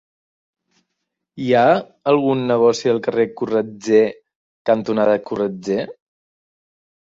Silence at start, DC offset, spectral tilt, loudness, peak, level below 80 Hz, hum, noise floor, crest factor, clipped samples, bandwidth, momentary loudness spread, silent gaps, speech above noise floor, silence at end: 1.35 s; under 0.1%; -6 dB/octave; -18 LUFS; -2 dBFS; -62 dBFS; none; -78 dBFS; 16 dB; under 0.1%; 7.8 kHz; 8 LU; 4.35-4.65 s; 60 dB; 1.1 s